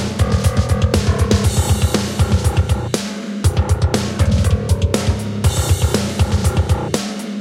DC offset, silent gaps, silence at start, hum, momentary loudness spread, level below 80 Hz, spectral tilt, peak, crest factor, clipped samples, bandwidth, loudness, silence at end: under 0.1%; none; 0 s; none; 4 LU; -22 dBFS; -5.5 dB/octave; 0 dBFS; 16 dB; under 0.1%; 16 kHz; -17 LUFS; 0 s